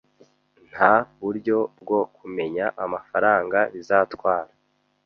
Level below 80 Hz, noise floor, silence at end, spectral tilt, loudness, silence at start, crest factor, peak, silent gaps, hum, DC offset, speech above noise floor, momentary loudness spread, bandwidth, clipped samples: -64 dBFS; -68 dBFS; 0.6 s; -7 dB/octave; -23 LUFS; 0.75 s; 22 dB; 0 dBFS; none; none; under 0.1%; 46 dB; 12 LU; 6.8 kHz; under 0.1%